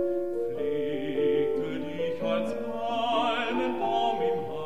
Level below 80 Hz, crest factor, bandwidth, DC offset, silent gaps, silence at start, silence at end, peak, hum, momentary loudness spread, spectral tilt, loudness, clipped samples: -66 dBFS; 14 dB; 11.5 kHz; 0.9%; none; 0 s; 0 s; -14 dBFS; none; 6 LU; -6 dB/octave; -29 LUFS; under 0.1%